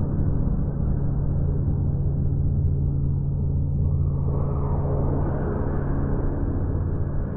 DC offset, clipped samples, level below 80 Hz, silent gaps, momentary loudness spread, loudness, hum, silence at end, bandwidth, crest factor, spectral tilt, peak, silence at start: under 0.1%; under 0.1%; -28 dBFS; none; 3 LU; -25 LUFS; none; 0 s; 2 kHz; 10 dB; -15 dB/octave; -12 dBFS; 0 s